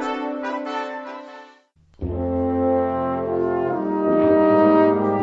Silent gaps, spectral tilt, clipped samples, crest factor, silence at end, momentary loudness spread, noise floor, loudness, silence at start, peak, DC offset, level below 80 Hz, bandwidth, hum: none; -8.5 dB/octave; under 0.1%; 16 dB; 0 s; 17 LU; -54 dBFS; -20 LUFS; 0 s; -4 dBFS; under 0.1%; -44 dBFS; 7.6 kHz; none